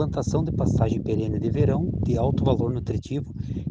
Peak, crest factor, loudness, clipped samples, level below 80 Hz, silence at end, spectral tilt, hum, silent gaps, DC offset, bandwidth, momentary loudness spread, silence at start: -8 dBFS; 16 dB; -25 LUFS; under 0.1%; -36 dBFS; 0 s; -8.5 dB/octave; none; none; under 0.1%; 7.8 kHz; 8 LU; 0 s